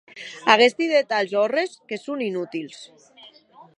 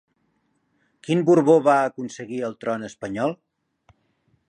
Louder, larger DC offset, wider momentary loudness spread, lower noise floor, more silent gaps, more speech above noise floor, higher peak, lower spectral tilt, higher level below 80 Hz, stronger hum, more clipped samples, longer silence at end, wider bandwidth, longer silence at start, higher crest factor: about the same, -21 LUFS vs -21 LUFS; neither; first, 19 LU vs 16 LU; second, -50 dBFS vs -69 dBFS; neither; second, 28 dB vs 48 dB; first, 0 dBFS vs -4 dBFS; second, -3.5 dB/octave vs -6.5 dB/octave; second, -78 dBFS vs -68 dBFS; neither; neither; second, 0.5 s vs 1.15 s; about the same, 10.5 kHz vs 10.5 kHz; second, 0.15 s vs 1.1 s; about the same, 22 dB vs 20 dB